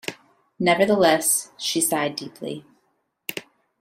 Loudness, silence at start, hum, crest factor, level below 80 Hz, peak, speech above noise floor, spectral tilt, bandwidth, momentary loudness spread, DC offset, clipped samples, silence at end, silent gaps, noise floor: -20 LUFS; 0.05 s; none; 20 dB; -64 dBFS; -4 dBFS; 49 dB; -3 dB/octave; 16 kHz; 18 LU; under 0.1%; under 0.1%; 0.4 s; none; -70 dBFS